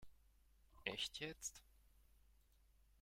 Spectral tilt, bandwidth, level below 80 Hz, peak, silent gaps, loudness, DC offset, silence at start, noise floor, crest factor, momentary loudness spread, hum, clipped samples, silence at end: -1.5 dB/octave; 16 kHz; -72 dBFS; -24 dBFS; none; -48 LUFS; under 0.1%; 0 s; -73 dBFS; 30 dB; 7 LU; none; under 0.1%; 0.25 s